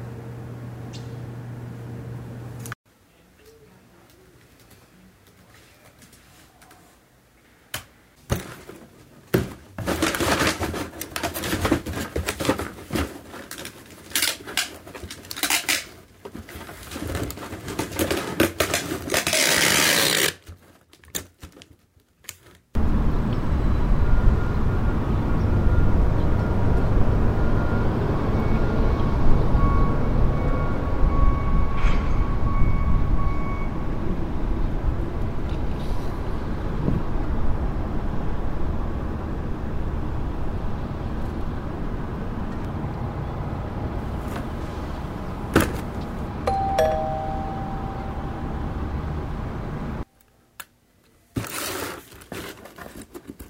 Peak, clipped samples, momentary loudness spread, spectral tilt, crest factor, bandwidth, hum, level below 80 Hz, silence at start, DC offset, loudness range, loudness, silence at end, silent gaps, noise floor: -2 dBFS; under 0.1%; 15 LU; -4.5 dB/octave; 20 dB; 16 kHz; none; -28 dBFS; 0 s; under 0.1%; 12 LU; -26 LUFS; 0 s; 2.75-2.84 s; -60 dBFS